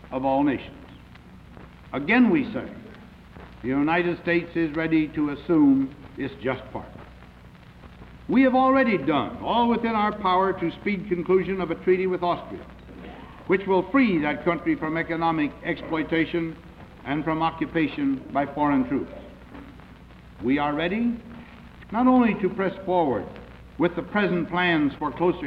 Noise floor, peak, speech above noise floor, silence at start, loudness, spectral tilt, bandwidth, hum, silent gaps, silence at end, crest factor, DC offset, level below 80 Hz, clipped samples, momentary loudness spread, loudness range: -47 dBFS; -8 dBFS; 24 dB; 0.05 s; -24 LUFS; -8.5 dB/octave; 5.4 kHz; none; none; 0 s; 16 dB; under 0.1%; -50 dBFS; under 0.1%; 20 LU; 4 LU